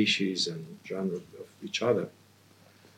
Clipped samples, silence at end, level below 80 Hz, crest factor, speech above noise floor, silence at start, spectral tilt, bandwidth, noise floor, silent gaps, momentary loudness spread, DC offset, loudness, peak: under 0.1%; 0.85 s; -82 dBFS; 20 dB; 28 dB; 0 s; -4 dB/octave; 16 kHz; -59 dBFS; none; 15 LU; under 0.1%; -31 LUFS; -12 dBFS